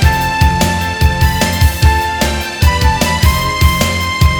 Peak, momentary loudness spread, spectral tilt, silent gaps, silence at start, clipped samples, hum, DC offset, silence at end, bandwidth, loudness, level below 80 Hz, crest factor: 0 dBFS; 3 LU; -4.5 dB/octave; none; 0 s; 0.2%; none; under 0.1%; 0 s; over 20 kHz; -12 LUFS; -16 dBFS; 12 dB